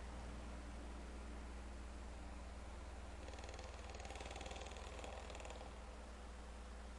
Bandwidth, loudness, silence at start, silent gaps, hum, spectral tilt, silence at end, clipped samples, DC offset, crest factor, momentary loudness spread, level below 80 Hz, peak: 11.5 kHz; -53 LUFS; 0 s; none; none; -4.5 dB/octave; 0 s; under 0.1%; under 0.1%; 14 dB; 4 LU; -54 dBFS; -36 dBFS